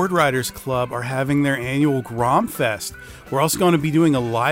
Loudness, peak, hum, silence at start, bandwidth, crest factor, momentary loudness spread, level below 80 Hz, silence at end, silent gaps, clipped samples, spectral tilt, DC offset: -20 LUFS; -4 dBFS; none; 0 s; 16 kHz; 16 dB; 7 LU; -48 dBFS; 0 s; none; under 0.1%; -5.5 dB/octave; under 0.1%